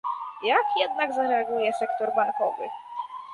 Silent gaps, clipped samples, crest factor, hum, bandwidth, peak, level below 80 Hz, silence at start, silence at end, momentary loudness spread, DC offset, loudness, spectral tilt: none; under 0.1%; 18 dB; none; 11.5 kHz; -8 dBFS; -76 dBFS; 0.05 s; 0 s; 12 LU; under 0.1%; -26 LUFS; -3.5 dB/octave